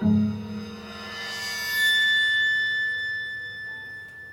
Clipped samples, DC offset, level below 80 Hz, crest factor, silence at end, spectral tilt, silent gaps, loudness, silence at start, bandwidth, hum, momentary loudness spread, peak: under 0.1%; under 0.1%; -60 dBFS; 14 dB; 0 s; -3.5 dB/octave; none; -23 LUFS; 0 s; 16.5 kHz; none; 17 LU; -12 dBFS